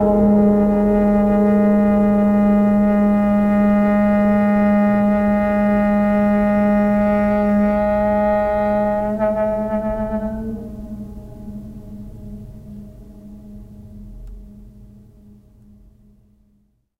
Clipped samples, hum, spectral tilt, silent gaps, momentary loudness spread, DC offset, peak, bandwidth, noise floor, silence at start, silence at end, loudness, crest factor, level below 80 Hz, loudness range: under 0.1%; none; -10 dB/octave; none; 20 LU; under 0.1%; -6 dBFS; 4.1 kHz; -61 dBFS; 0 s; 2.3 s; -16 LUFS; 12 dB; -36 dBFS; 20 LU